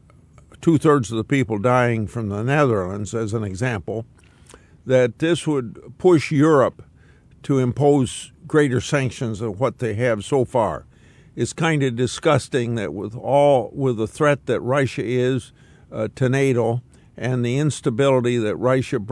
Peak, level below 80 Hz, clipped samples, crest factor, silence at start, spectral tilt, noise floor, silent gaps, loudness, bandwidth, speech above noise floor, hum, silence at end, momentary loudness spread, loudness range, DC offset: -4 dBFS; -54 dBFS; under 0.1%; 16 dB; 0.6 s; -6.5 dB/octave; -50 dBFS; none; -20 LUFS; 12 kHz; 31 dB; none; 0 s; 10 LU; 3 LU; under 0.1%